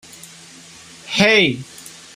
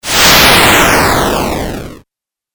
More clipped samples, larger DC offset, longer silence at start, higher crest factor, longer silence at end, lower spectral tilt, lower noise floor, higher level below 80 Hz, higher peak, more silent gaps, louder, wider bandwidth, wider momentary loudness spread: second, under 0.1% vs 0.3%; neither; first, 1.05 s vs 0.05 s; first, 20 dB vs 10 dB; second, 0.25 s vs 0.6 s; about the same, -3.5 dB/octave vs -2.5 dB/octave; second, -42 dBFS vs -81 dBFS; second, -56 dBFS vs -26 dBFS; about the same, -2 dBFS vs 0 dBFS; neither; second, -15 LUFS vs -6 LUFS; second, 16 kHz vs over 20 kHz; first, 26 LU vs 16 LU